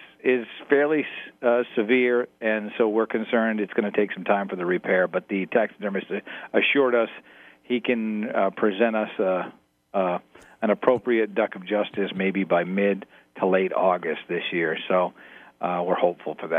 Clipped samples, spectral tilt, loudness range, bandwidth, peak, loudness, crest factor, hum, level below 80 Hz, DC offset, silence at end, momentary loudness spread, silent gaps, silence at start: under 0.1%; -8 dB/octave; 2 LU; 3.9 kHz; -4 dBFS; -24 LUFS; 20 dB; none; -76 dBFS; under 0.1%; 0 s; 8 LU; none; 0 s